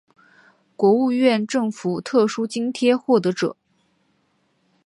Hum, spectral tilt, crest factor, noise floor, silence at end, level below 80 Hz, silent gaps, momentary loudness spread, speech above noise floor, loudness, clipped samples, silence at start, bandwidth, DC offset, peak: none; -5.5 dB/octave; 16 dB; -66 dBFS; 1.35 s; -74 dBFS; none; 8 LU; 47 dB; -20 LUFS; under 0.1%; 0.8 s; 11.5 kHz; under 0.1%; -4 dBFS